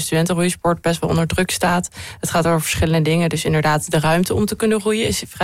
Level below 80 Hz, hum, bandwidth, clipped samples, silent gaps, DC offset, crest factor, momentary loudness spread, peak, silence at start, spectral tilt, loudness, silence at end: -38 dBFS; none; 16 kHz; under 0.1%; none; under 0.1%; 10 dB; 3 LU; -8 dBFS; 0 s; -5 dB/octave; -18 LUFS; 0 s